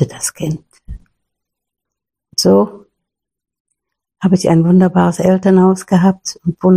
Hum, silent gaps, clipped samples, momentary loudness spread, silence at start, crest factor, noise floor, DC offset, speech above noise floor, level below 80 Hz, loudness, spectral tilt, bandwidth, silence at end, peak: none; 3.60-3.65 s; under 0.1%; 11 LU; 0 s; 14 dB; -83 dBFS; under 0.1%; 72 dB; -44 dBFS; -13 LUFS; -6.5 dB/octave; 15 kHz; 0 s; 0 dBFS